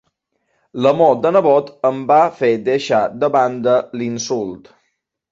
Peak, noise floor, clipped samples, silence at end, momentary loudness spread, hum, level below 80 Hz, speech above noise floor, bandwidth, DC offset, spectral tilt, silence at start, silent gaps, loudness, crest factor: -2 dBFS; -70 dBFS; under 0.1%; 0.75 s; 10 LU; none; -62 dBFS; 55 dB; 7.8 kHz; under 0.1%; -5.5 dB/octave; 0.75 s; none; -16 LUFS; 16 dB